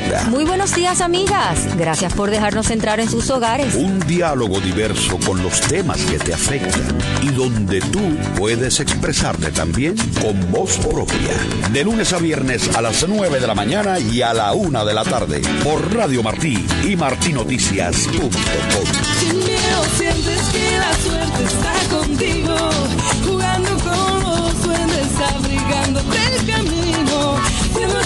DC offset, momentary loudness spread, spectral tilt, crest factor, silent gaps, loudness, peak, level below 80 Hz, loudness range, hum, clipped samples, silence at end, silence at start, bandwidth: under 0.1%; 3 LU; -4 dB/octave; 16 dB; none; -17 LUFS; -2 dBFS; -30 dBFS; 1 LU; none; under 0.1%; 0 s; 0 s; 12.5 kHz